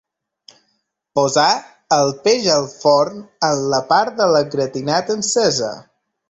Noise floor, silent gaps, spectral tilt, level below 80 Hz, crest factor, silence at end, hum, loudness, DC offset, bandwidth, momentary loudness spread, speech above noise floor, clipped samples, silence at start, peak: -69 dBFS; none; -3 dB/octave; -60 dBFS; 16 dB; 0.5 s; none; -17 LUFS; under 0.1%; 8.4 kHz; 7 LU; 52 dB; under 0.1%; 1.15 s; -2 dBFS